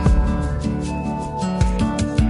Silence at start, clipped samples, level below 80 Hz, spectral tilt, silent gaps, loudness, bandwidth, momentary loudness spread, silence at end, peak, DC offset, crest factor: 0 s; under 0.1%; -22 dBFS; -7 dB/octave; none; -22 LUFS; 11 kHz; 5 LU; 0 s; -4 dBFS; under 0.1%; 14 dB